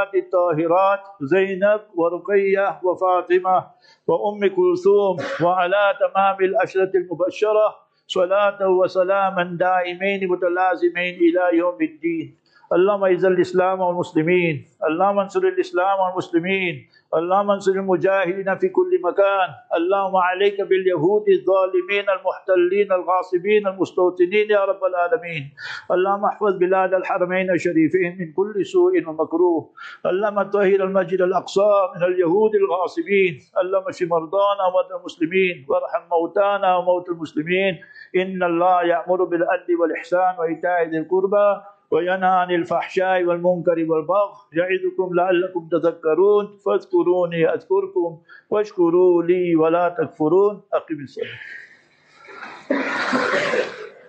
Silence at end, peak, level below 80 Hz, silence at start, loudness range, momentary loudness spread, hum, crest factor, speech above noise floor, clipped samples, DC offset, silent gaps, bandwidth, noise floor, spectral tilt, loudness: 0.2 s; -6 dBFS; -74 dBFS; 0 s; 2 LU; 7 LU; none; 14 dB; 34 dB; under 0.1%; under 0.1%; none; 8.2 kHz; -53 dBFS; -6.5 dB/octave; -20 LUFS